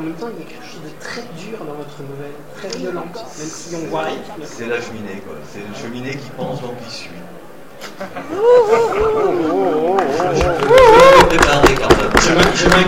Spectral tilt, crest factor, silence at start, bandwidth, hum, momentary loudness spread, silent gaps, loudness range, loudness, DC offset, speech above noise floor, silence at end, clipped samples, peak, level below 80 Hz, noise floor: -4.5 dB/octave; 16 dB; 0 s; 16.5 kHz; none; 23 LU; none; 18 LU; -12 LUFS; 1%; 21 dB; 0 s; under 0.1%; 0 dBFS; -32 dBFS; -37 dBFS